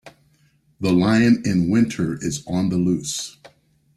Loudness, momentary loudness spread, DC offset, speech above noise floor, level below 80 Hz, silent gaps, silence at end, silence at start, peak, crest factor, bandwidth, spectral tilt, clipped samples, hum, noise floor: -20 LUFS; 11 LU; under 0.1%; 41 dB; -52 dBFS; none; 0.5 s; 0.05 s; -6 dBFS; 16 dB; 13.5 kHz; -5.5 dB/octave; under 0.1%; none; -60 dBFS